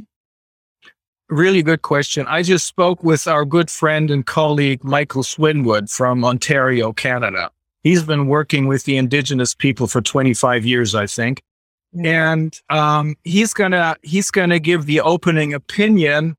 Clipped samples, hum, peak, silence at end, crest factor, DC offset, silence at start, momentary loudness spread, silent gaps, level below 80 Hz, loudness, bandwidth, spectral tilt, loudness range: under 0.1%; none; 0 dBFS; 0.05 s; 16 dB; under 0.1%; 0 s; 4 LU; 0.16-0.75 s, 1.08-1.13 s, 11.51-11.78 s; -58 dBFS; -16 LUFS; 16 kHz; -5 dB/octave; 1 LU